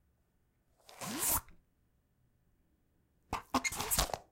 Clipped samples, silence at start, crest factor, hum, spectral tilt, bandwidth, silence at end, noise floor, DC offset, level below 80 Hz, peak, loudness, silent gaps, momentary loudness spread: under 0.1%; 0.9 s; 30 dB; none; -2 dB/octave; 16.5 kHz; 0.1 s; -75 dBFS; under 0.1%; -52 dBFS; -12 dBFS; -34 LUFS; none; 12 LU